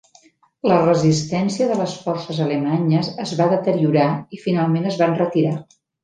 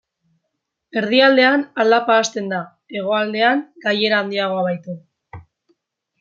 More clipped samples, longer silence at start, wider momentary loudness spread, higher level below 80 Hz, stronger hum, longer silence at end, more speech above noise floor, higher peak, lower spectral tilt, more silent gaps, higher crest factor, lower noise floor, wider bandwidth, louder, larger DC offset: neither; second, 0.65 s vs 0.95 s; second, 8 LU vs 14 LU; first, -60 dBFS vs -66 dBFS; neither; second, 0.4 s vs 0.8 s; second, 36 dB vs 59 dB; about the same, -2 dBFS vs -2 dBFS; first, -6.5 dB/octave vs -4 dB/octave; neither; about the same, 16 dB vs 18 dB; second, -54 dBFS vs -77 dBFS; first, 9.4 kHz vs 7.4 kHz; about the same, -19 LUFS vs -17 LUFS; neither